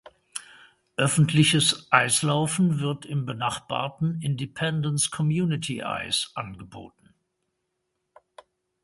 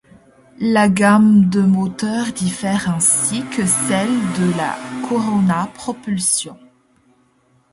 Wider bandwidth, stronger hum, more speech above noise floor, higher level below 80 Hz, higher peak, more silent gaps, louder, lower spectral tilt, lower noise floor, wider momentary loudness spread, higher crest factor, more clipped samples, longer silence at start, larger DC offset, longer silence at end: about the same, 11.5 kHz vs 11.5 kHz; neither; first, 54 dB vs 41 dB; second, -60 dBFS vs -54 dBFS; about the same, -2 dBFS vs 0 dBFS; neither; second, -24 LUFS vs -16 LUFS; about the same, -4 dB/octave vs -4.5 dB/octave; first, -78 dBFS vs -58 dBFS; first, 19 LU vs 11 LU; first, 26 dB vs 16 dB; neither; second, 0.35 s vs 0.6 s; neither; first, 1.95 s vs 1.2 s